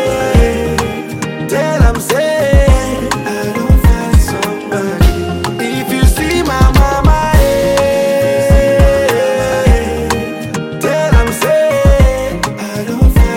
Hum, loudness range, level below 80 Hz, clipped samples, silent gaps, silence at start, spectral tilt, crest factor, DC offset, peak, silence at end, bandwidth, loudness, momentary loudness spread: none; 3 LU; -14 dBFS; under 0.1%; none; 0 s; -6 dB/octave; 10 dB; under 0.1%; 0 dBFS; 0 s; 17 kHz; -12 LUFS; 8 LU